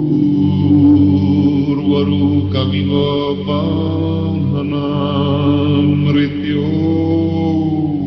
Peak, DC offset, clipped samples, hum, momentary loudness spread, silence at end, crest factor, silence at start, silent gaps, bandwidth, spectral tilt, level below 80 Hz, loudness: -2 dBFS; under 0.1%; under 0.1%; none; 6 LU; 0 s; 12 dB; 0 s; none; 5.8 kHz; -10 dB/octave; -44 dBFS; -14 LUFS